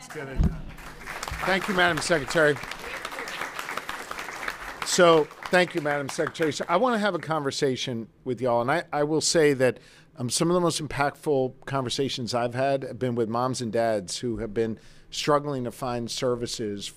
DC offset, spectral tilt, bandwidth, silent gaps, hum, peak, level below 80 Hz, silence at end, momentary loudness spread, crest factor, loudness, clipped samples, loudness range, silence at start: under 0.1%; -4 dB/octave; 16 kHz; none; none; -8 dBFS; -44 dBFS; 0.05 s; 12 LU; 18 dB; -26 LUFS; under 0.1%; 4 LU; 0 s